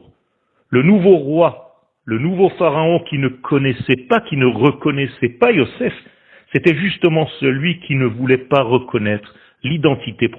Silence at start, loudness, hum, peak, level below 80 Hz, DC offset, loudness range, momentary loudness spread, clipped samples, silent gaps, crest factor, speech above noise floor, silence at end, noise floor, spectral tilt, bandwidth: 0.7 s; -16 LUFS; none; 0 dBFS; -52 dBFS; under 0.1%; 1 LU; 8 LU; under 0.1%; none; 16 dB; 49 dB; 0 s; -64 dBFS; -9 dB/octave; 4.4 kHz